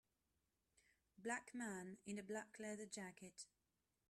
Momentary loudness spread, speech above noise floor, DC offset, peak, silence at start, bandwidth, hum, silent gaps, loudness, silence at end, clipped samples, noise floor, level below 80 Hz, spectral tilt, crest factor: 10 LU; 38 dB; under 0.1%; -32 dBFS; 1.2 s; 13 kHz; none; none; -52 LUFS; 0.65 s; under 0.1%; -90 dBFS; -88 dBFS; -4 dB/octave; 22 dB